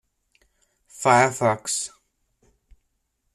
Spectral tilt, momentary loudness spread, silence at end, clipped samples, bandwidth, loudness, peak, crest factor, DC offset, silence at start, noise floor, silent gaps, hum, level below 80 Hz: -3.5 dB/octave; 10 LU; 1.45 s; under 0.1%; 14 kHz; -21 LUFS; -4 dBFS; 22 dB; under 0.1%; 0.95 s; -73 dBFS; none; none; -62 dBFS